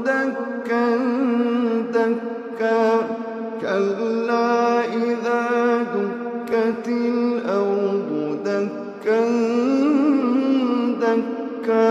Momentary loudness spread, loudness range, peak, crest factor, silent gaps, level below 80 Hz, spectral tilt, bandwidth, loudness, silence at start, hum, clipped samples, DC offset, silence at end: 8 LU; 2 LU; -6 dBFS; 14 dB; none; -76 dBFS; -6.5 dB/octave; 8 kHz; -21 LUFS; 0 s; none; under 0.1%; under 0.1%; 0 s